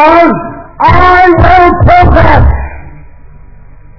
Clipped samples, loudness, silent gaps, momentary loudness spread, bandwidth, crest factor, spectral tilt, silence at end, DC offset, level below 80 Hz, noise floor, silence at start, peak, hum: 10%; -5 LUFS; none; 12 LU; 5.4 kHz; 6 dB; -8.5 dB/octave; 0 s; under 0.1%; -14 dBFS; -32 dBFS; 0 s; 0 dBFS; none